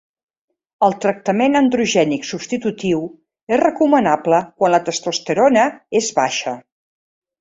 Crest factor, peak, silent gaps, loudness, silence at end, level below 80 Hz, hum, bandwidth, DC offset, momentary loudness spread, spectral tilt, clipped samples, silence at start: 16 dB; -2 dBFS; 3.43-3.47 s; -17 LUFS; 0.8 s; -60 dBFS; none; 8 kHz; under 0.1%; 8 LU; -4.5 dB/octave; under 0.1%; 0.8 s